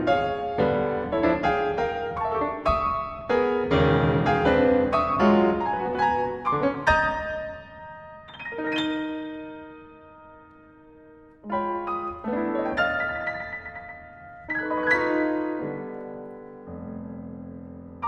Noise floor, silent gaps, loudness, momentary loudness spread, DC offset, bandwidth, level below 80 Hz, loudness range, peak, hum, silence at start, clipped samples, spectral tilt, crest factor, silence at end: -51 dBFS; none; -25 LUFS; 20 LU; under 0.1%; 8.8 kHz; -44 dBFS; 11 LU; -6 dBFS; none; 0 s; under 0.1%; -7 dB/octave; 20 dB; 0 s